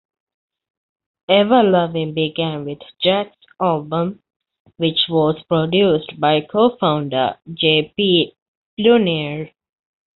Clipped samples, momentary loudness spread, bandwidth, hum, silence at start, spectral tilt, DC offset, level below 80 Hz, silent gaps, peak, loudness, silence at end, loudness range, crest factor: under 0.1%; 12 LU; 4.4 kHz; none; 1.3 s; -3.5 dB/octave; under 0.1%; -58 dBFS; 4.36-4.40 s, 4.60-4.65 s, 8.42-8.77 s; -2 dBFS; -17 LUFS; 0.7 s; 3 LU; 16 dB